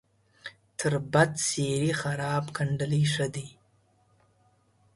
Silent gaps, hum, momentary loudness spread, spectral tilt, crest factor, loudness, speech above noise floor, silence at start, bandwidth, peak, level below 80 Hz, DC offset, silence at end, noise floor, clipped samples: none; none; 19 LU; -4.5 dB/octave; 22 dB; -27 LUFS; 39 dB; 0.45 s; 11.5 kHz; -8 dBFS; -62 dBFS; under 0.1%; 1.45 s; -66 dBFS; under 0.1%